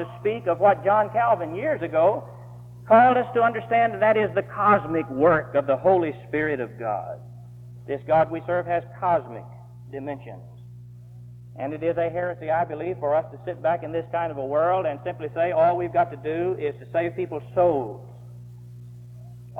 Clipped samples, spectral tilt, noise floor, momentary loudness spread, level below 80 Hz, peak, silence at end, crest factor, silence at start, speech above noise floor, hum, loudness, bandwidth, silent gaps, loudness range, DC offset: under 0.1%; -8.5 dB/octave; -43 dBFS; 23 LU; -58 dBFS; -4 dBFS; 0 s; 18 dB; 0 s; 20 dB; 60 Hz at -60 dBFS; -23 LUFS; 4.3 kHz; none; 9 LU; under 0.1%